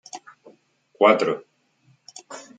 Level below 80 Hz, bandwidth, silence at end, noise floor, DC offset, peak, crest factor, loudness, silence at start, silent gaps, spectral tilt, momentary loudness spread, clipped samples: -76 dBFS; 9.2 kHz; 0.15 s; -62 dBFS; under 0.1%; -2 dBFS; 24 dB; -20 LUFS; 0.15 s; none; -4 dB/octave; 26 LU; under 0.1%